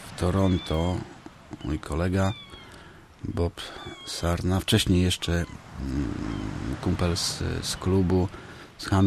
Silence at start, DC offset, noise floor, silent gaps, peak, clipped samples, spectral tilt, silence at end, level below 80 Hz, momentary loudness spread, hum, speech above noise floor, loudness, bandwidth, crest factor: 0 s; under 0.1%; -48 dBFS; none; -6 dBFS; under 0.1%; -5.5 dB/octave; 0 s; -40 dBFS; 18 LU; none; 22 dB; -27 LUFS; 13.5 kHz; 20 dB